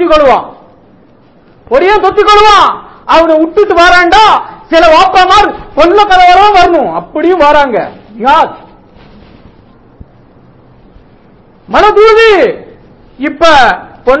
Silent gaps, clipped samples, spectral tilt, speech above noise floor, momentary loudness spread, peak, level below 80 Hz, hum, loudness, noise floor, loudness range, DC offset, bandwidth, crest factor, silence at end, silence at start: none; 8%; -3.5 dB/octave; 36 dB; 11 LU; 0 dBFS; -32 dBFS; none; -5 LUFS; -41 dBFS; 10 LU; under 0.1%; 8 kHz; 8 dB; 0 s; 0 s